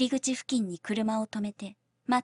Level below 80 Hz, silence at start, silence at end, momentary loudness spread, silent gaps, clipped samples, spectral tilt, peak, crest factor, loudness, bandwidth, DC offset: -72 dBFS; 0 s; 0 s; 13 LU; none; under 0.1%; -4 dB/octave; -14 dBFS; 16 dB; -31 LUFS; 11 kHz; under 0.1%